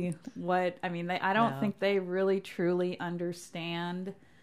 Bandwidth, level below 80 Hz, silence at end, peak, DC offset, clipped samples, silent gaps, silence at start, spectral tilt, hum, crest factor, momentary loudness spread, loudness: 14.5 kHz; -76 dBFS; 0.3 s; -16 dBFS; under 0.1%; under 0.1%; none; 0 s; -6.5 dB/octave; none; 16 dB; 9 LU; -32 LUFS